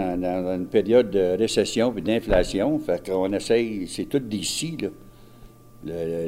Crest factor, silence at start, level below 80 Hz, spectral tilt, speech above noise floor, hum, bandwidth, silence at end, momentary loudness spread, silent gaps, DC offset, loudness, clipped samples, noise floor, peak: 18 dB; 0 s; -42 dBFS; -5 dB/octave; 24 dB; none; 16 kHz; 0 s; 10 LU; none; under 0.1%; -24 LUFS; under 0.1%; -47 dBFS; -6 dBFS